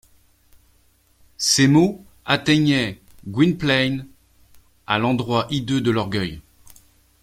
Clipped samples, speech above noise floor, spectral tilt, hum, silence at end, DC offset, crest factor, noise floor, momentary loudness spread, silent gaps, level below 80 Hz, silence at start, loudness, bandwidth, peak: under 0.1%; 40 dB; -4.5 dB/octave; none; 0.85 s; under 0.1%; 20 dB; -59 dBFS; 14 LU; none; -52 dBFS; 1.4 s; -20 LUFS; 16 kHz; -2 dBFS